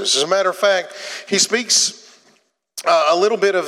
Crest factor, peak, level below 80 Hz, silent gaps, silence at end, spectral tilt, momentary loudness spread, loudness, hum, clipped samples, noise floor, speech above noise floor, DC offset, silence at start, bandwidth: 16 dB; -2 dBFS; -84 dBFS; none; 0 s; -1 dB/octave; 11 LU; -16 LUFS; none; under 0.1%; -59 dBFS; 42 dB; under 0.1%; 0 s; 16 kHz